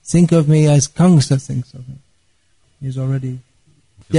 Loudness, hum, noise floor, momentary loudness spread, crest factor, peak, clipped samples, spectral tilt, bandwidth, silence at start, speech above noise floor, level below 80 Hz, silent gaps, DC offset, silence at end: -15 LUFS; none; -61 dBFS; 19 LU; 14 dB; -2 dBFS; under 0.1%; -6.5 dB/octave; 11 kHz; 0.05 s; 47 dB; -46 dBFS; none; 0.2%; 0 s